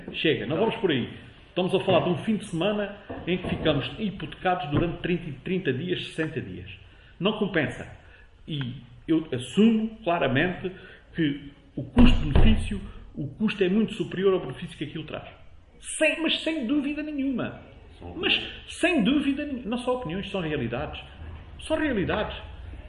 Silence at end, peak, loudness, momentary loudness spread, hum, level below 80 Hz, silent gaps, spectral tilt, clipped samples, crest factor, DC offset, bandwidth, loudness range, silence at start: 0 s; -4 dBFS; -27 LUFS; 16 LU; none; -36 dBFS; none; -6 dB/octave; under 0.1%; 22 dB; under 0.1%; 11.5 kHz; 5 LU; 0 s